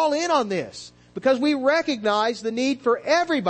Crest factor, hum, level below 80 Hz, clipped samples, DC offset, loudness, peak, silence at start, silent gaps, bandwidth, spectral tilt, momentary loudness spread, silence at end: 14 dB; none; -64 dBFS; under 0.1%; under 0.1%; -22 LUFS; -8 dBFS; 0 s; none; 8.8 kHz; -4 dB/octave; 8 LU; 0 s